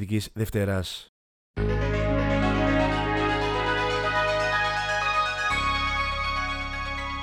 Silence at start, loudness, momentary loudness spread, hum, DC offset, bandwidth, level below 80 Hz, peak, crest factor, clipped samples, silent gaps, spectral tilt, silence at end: 0 s; -25 LUFS; 7 LU; none; under 0.1%; 17.5 kHz; -36 dBFS; -10 dBFS; 16 dB; under 0.1%; 1.09-1.54 s; -5 dB/octave; 0 s